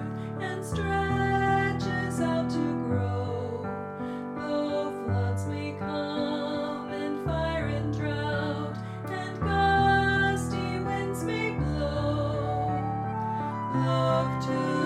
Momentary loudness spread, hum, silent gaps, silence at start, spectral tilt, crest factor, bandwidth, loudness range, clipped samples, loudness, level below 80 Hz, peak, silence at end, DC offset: 9 LU; none; none; 0 s; -6.5 dB/octave; 16 dB; 14 kHz; 4 LU; under 0.1%; -29 LUFS; -44 dBFS; -12 dBFS; 0 s; under 0.1%